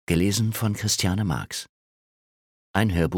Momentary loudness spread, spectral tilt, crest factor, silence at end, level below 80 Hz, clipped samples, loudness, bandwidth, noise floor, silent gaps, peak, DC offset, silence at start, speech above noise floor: 11 LU; -4.5 dB/octave; 20 dB; 0 s; -44 dBFS; under 0.1%; -25 LUFS; 18.5 kHz; under -90 dBFS; 1.69-2.74 s; -4 dBFS; under 0.1%; 0.1 s; over 67 dB